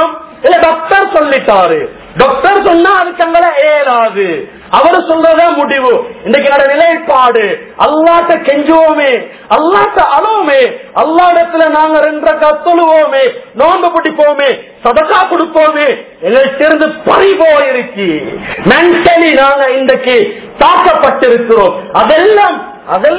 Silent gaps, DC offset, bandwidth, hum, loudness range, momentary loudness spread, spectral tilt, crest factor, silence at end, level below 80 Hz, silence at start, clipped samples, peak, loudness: none; under 0.1%; 4 kHz; none; 1 LU; 7 LU; -8 dB/octave; 8 dB; 0 s; -44 dBFS; 0 s; 4%; 0 dBFS; -8 LUFS